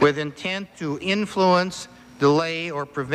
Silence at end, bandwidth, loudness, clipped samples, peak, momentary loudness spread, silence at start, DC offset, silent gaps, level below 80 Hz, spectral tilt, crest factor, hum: 0 s; 12.5 kHz; -23 LUFS; under 0.1%; -4 dBFS; 10 LU; 0 s; under 0.1%; none; -58 dBFS; -5.5 dB/octave; 18 dB; none